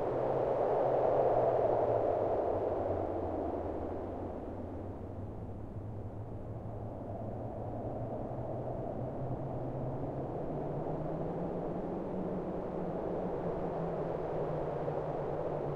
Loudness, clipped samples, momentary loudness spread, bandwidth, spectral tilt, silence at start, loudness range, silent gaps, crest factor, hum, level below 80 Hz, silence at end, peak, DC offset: -36 LUFS; under 0.1%; 13 LU; 8 kHz; -10 dB/octave; 0 s; 11 LU; none; 16 dB; none; -52 dBFS; 0 s; -18 dBFS; 0.1%